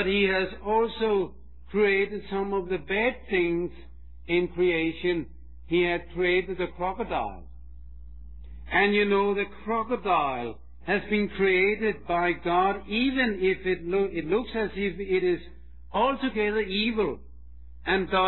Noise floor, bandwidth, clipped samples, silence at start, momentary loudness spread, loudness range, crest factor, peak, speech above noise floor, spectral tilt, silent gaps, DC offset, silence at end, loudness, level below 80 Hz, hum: -47 dBFS; 4.3 kHz; under 0.1%; 0 s; 9 LU; 3 LU; 18 dB; -10 dBFS; 21 dB; -9 dB/octave; none; 0.6%; 0 s; -26 LUFS; -48 dBFS; none